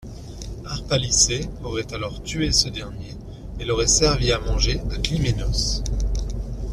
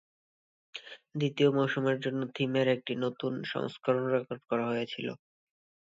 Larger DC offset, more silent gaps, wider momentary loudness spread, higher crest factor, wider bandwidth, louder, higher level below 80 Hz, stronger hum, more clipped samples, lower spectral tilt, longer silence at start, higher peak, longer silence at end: neither; neither; first, 19 LU vs 16 LU; about the same, 20 dB vs 20 dB; first, 13.5 kHz vs 7.8 kHz; first, -22 LUFS vs -31 LUFS; first, -28 dBFS vs -78 dBFS; neither; neither; second, -3 dB/octave vs -7 dB/octave; second, 0 s vs 0.75 s; first, -4 dBFS vs -12 dBFS; second, 0 s vs 0.7 s